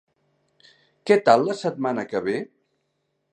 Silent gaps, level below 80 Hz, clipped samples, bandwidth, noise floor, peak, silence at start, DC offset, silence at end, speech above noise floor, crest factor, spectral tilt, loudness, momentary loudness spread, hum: none; -72 dBFS; under 0.1%; 9.6 kHz; -74 dBFS; -2 dBFS; 1.05 s; under 0.1%; 0.9 s; 53 dB; 24 dB; -5.5 dB/octave; -22 LUFS; 16 LU; none